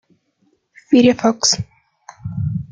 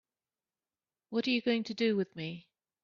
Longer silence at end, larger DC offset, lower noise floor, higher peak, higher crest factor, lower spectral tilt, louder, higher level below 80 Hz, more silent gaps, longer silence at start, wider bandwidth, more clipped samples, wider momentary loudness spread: second, 0.05 s vs 0.45 s; neither; second, -63 dBFS vs under -90 dBFS; first, -2 dBFS vs -18 dBFS; about the same, 16 dB vs 16 dB; about the same, -4 dB/octave vs -4 dB/octave; first, -16 LUFS vs -33 LUFS; first, -50 dBFS vs -78 dBFS; neither; second, 0.9 s vs 1.1 s; first, 9.4 kHz vs 7.2 kHz; neither; first, 19 LU vs 12 LU